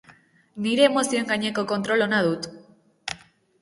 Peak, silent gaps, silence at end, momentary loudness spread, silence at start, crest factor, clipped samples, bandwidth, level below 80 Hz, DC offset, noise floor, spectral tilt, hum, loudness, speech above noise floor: -4 dBFS; none; 0.45 s; 18 LU; 0.55 s; 20 dB; under 0.1%; 11.5 kHz; -66 dBFS; under 0.1%; -55 dBFS; -4 dB/octave; none; -23 LUFS; 33 dB